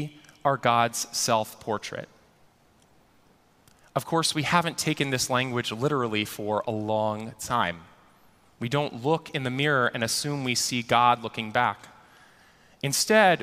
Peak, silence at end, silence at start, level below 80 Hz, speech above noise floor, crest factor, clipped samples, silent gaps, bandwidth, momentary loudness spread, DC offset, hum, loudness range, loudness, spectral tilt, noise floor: -4 dBFS; 0 s; 0 s; -64 dBFS; 35 dB; 22 dB; under 0.1%; none; 15.5 kHz; 11 LU; under 0.1%; none; 5 LU; -26 LUFS; -3.5 dB/octave; -61 dBFS